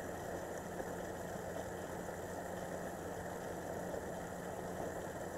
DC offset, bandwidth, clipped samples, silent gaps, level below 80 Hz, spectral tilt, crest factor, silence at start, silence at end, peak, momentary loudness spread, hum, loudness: under 0.1%; 16 kHz; under 0.1%; none; -62 dBFS; -5 dB/octave; 16 dB; 0 s; 0 s; -28 dBFS; 1 LU; none; -44 LUFS